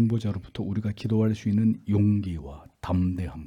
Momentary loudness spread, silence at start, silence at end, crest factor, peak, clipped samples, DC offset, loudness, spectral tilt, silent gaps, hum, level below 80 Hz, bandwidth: 11 LU; 0 s; 0 s; 14 dB; -12 dBFS; under 0.1%; under 0.1%; -26 LUFS; -9 dB/octave; none; none; -50 dBFS; 9 kHz